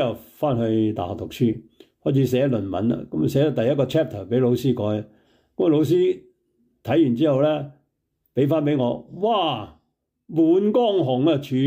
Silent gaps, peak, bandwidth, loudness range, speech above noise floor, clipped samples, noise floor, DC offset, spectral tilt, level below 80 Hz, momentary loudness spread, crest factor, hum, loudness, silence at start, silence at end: none; -8 dBFS; 16 kHz; 2 LU; 52 dB; under 0.1%; -73 dBFS; under 0.1%; -8 dB/octave; -60 dBFS; 11 LU; 14 dB; none; -22 LUFS; 0 s; 0 s